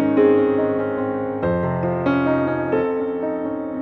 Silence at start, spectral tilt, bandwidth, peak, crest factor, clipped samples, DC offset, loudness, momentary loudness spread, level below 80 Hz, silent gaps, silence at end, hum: 0 s; -10.5 dB/octave; 4.6 kHz; -4 dBFS; 16 dB; under 0.1%; under 0.1%; -20 LUFS; 8 LU; -50 dBFS; none; 0 s; none